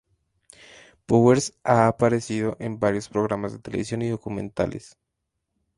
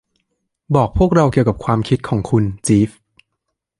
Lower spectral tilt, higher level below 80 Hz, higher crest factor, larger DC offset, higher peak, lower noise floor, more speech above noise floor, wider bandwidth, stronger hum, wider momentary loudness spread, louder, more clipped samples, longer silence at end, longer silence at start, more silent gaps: about the same, -6.5 dB/octave vs -7 dB/octave; second, -54 dBFS vs -34 dBFS; about the same, 20 dB vs 16 dB; neither; about the same, -4 dBFS vs -2 dBFS; first, -80 dBFS vs -76 dBFS; second, 57 dB vs 61 dB; about the same, 11.5 kHz vs 11.5 kHz; neither; first, 12 LU vs 5 LU; second, -23 LUFS vs -16 LUFS; neither; about the same, 0.9 s vs 0.9 s; first, 1.1 s vs 0.7 s; neither